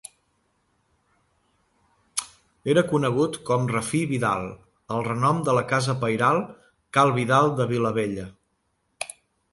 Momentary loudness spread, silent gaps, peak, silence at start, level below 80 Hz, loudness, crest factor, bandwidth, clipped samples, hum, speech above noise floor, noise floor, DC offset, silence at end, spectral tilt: 15 LU; none; -6 dBFS; 2.15 s; -60 dBFS; -24 LUFS; 20 dB; 11.5 kHz; under 0.1%; none; 50 dB; -72 dBFS; under 0.1%; 0.45 s; -5.5 dB/octave